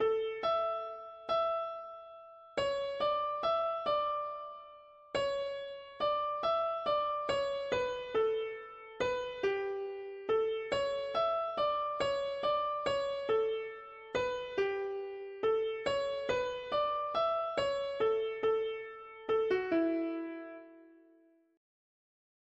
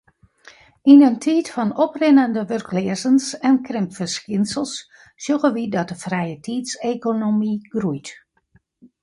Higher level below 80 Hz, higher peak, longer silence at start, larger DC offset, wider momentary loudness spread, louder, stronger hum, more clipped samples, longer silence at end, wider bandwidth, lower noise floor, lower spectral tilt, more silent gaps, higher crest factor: about the same, -66 dBFS vs -64 dBFS; second, -20 dBFS vs -2 dBFS; second, 0 s vs 0.85 s; neither; about the same, 11 LU vs 12 LU; second, -34 LUFS vs -19 LUFS; neither; neither; first, 1.65 s vs 0.9 s; second, 8.2 kHz vs 11.5 kHz; first, -66 dBFS vs -60 dBFS; about the same, -4.5 dB/octave vs -5.5 dB/octave; neither; about the same, 14 dB vs 18 dB